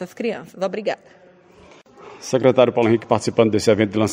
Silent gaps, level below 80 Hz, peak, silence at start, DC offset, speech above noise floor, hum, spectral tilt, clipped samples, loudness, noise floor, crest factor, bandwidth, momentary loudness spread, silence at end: none; -58 dBFS; 0 dBFS; 0 s; under 0.1%; 29 dB; none; -5.5 dB/octave; under 0.1%; -19 LUFS; -48 dBFS; 20 dB; 16 kHz; 11 LU; 0 s